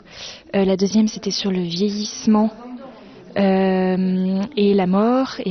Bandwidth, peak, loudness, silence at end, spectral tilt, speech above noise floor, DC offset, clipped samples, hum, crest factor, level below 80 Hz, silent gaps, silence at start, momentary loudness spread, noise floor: 6.4 kHz; -6 dBFS; -19 LUFS; 0 s; -6 dB/octave; 22 dB; under 0.1%; under 0.1%; none; 14 dB; -54 dBFS; none; 0.1 s; 12 LU; -40 dBFS